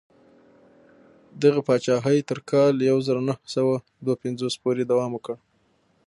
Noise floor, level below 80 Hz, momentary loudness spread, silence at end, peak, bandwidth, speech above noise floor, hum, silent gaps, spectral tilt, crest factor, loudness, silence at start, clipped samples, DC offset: -65 dBFS; -70 dBFS; 9 LU; 0.7 s; -6 dBFS; 11.5 kHz; 42 dB; none; none; -6.5 dB/octave; 18 dB; -23 LUFS; 1.35 s; under 0.1%; under 0.1%